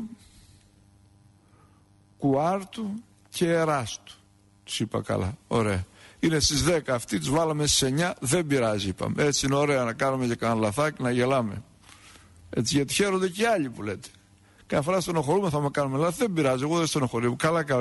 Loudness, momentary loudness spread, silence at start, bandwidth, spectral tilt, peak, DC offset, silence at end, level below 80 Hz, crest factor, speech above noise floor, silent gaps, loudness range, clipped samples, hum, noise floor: -26 LUFS; 11 LU; 0 s; 12 kHz; -4.5 dB/octave; -10 dBFS; under 0.1%; 0 s; -50 dBFS; 16 dB; 33 dB; none; 5 LU; under 0.1%; none; -59 dBFS